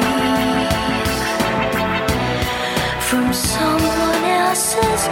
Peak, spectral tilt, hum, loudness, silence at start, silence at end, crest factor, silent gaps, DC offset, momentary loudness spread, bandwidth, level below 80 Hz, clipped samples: -2 dBFS; -3.5 dB/octave; none; -17 LUFS; 0 s; 0 s; 16 dB; none; under 0.1%; 3 LU; 17.5 kHz; -34 dBFS; under 0.1%